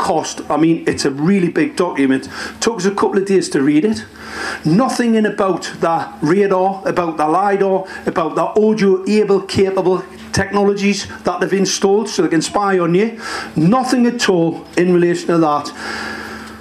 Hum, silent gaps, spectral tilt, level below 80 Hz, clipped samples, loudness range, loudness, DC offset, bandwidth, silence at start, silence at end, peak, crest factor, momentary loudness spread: none; none; -5.5 dB/octave; -52 dBFS; under 0.1%; 1 LU; -16 LUFS; under 0.1%; 13.5 kHz; 0 s; 0 s; -2 dBFS; 14 dB; 7 LU